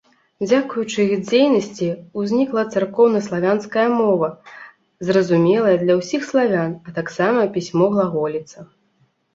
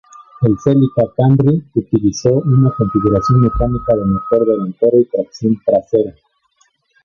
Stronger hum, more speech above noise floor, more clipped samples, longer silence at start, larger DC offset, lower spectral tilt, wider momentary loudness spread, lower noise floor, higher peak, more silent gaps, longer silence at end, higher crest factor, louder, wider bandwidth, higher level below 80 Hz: neither; about the same, 44 dB vs 46 dB; neither; first, 0.4 s vs 0.2 s; neither; second, -6.5 dB/octave vs -9 dB/octave; first, 10 LU vs 5 LU; about the same, -62 dBFS vs -59 dBFS; about the same, -4 dBFS vs -2 dBFS; neither; second, 0.7 s vs 0.95 s; about the same, 16 dB vs 12 dB; second, -19 LUFS vs -14 LUFS; first, 7.8 kHz vs 7 kHz; second, -62 dBFS vs -34 dBFS